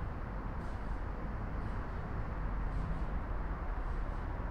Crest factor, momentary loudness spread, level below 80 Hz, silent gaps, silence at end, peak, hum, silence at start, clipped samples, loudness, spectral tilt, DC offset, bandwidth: 12 dB; 3 LU; -38 dBFS; none; 0 s; -26 dBFS; none; 0 s; under 0.1%; -41 LUFS; -8.5 dB/octave; under 0.1%; 5.6 kHz